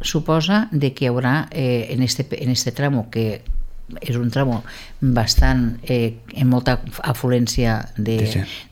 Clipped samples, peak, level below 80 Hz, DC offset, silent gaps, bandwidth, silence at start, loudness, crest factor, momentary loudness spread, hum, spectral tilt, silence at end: under 0.1%; -2 dBFS; -28 dBFS; under 0.1%; none; 17 kHz; 0 s; -20 LUFS; 18 dB; 8 LU; none; -5.5 dB/octave; 0.1 s